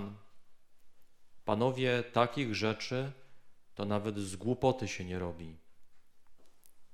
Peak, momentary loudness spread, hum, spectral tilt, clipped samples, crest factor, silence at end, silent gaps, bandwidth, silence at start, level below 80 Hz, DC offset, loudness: -12 dBFS; 12 LU; none; -5.5 dB/octave; under 0.1%; 24 dB; 0 s; none; 14.5 kHz; 0 s; -62 dBFS; under 0.1%; -34 LUFS